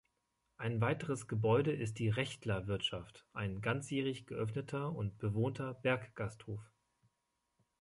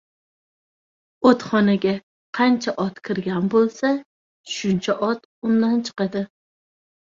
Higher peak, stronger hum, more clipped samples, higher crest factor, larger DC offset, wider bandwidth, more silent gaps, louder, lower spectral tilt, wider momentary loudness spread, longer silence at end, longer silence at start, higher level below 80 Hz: second, -18 dBFS vs -4 dBFS; neither; neither; about the same, 20 dB vs 18 dB; neither; first, 11.5 kHz vs 7.6 kHz; second, none vs 2.03-2.33 s, 4.05-4.44 s, 5.25-5.42 s; second, -38 LUFS vs -21 LUFS; about the same, -6 dB/octave vs -6 dB/octave; about the same, 11 LU vs 9 LU; first, 1.15 s vs 0.75 s; second, 0.6 s vs 1.2 s; about the same, -64 dBFS vs -62 dBFS